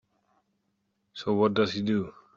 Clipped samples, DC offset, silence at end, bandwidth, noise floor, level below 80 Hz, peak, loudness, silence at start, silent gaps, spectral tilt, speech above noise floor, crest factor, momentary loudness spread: under 0.1%; under 0.1%; 0.25 s; 7.2 kHz; -76 dBFS; -66 dBFS; -12 dBFS; -27 LUFS; 1.15 s; none; -6.5 dB/octave; 50 dB; 18 dB; 11 LU